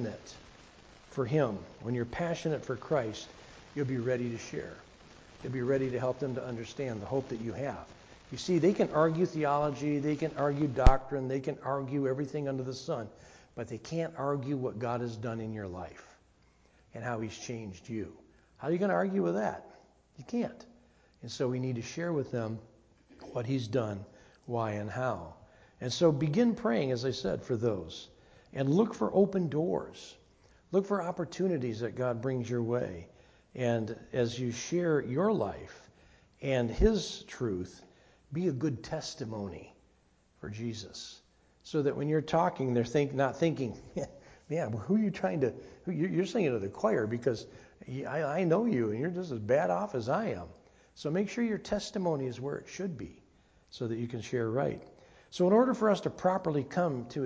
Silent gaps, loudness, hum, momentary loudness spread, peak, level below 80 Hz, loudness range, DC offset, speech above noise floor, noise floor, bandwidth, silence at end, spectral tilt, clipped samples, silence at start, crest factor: none; -33 LUFS; none; 16 LU; -6 dBFS; -46 dBFS; 6 LU; under 0.1%; 36 dB; -67 dBFS; 8 kHz; 0 s; -6.5 dB/octave; under 0.1%; 0 s; 26 dB